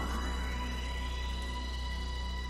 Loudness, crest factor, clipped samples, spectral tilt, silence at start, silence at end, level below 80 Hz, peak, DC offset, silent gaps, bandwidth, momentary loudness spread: -37 LUFS; 12 dB; under 0.1%; -4.5 dB/octave; 0 s; 0 s; -36 dBFS; -24 dBFS; under 0.1%; none; 13.5 kHz; 2 LU